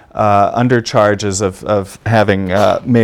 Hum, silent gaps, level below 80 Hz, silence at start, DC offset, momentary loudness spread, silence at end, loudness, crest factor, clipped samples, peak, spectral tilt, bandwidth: none; none; -44 dBFS; 0.15 s; under 0.1%; 6 LU; 0 s; -13 LUFS; 12 dB; 0.3%; 0 dBFS; -5.5 dB/octave; 14.5 kHz